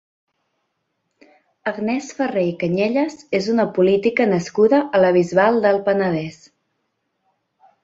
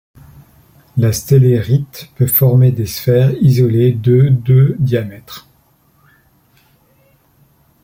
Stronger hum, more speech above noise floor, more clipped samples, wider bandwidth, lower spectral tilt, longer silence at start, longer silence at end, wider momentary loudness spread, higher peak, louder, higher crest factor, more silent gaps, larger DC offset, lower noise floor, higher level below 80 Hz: neither; first, 55 dB vs 42 dB; neither; second, 7.8 kHz vs 16.5 kHz; about the same, -6.5 dB/octave vs -7.5 dB/octave; first, 1.65 s vs 0.95 s; second, 1.5 s vs 2.45 s; second, 8 LU vs 14 LU; about the same, -4 dBFS vs -2 dBFS; second, -18 LUFS vs -13 LUFS; about the same, 16 dB vs 12 dB; neither; neither; first, -73 dBFS vs -54 dBFS; second, -62 dBFS vs -46 dBFS